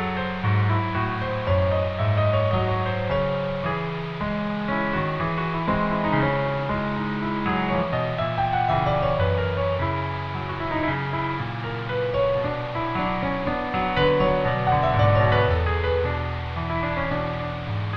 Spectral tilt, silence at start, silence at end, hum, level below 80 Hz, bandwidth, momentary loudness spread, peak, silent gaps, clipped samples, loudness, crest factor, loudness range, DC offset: -8.5 dB/octave; 0 s; 0 s; none; -38 dBFS; 6.2 kHz; 7 LU; -6 dBFS; none; under 0.1%; -24 LUFS; 16 dB; 4 LU; under 0.1%